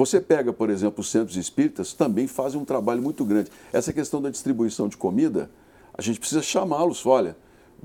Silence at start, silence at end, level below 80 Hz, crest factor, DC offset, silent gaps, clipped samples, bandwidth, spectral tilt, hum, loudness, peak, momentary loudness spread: 0 s; 0.5 s; -62 dBFS; 18 dB; under 0.1%; none; under 0.1%; 17.5 kHz; -5 dB/octave; none; -24 LUFS; -6 dBFS; 6 LU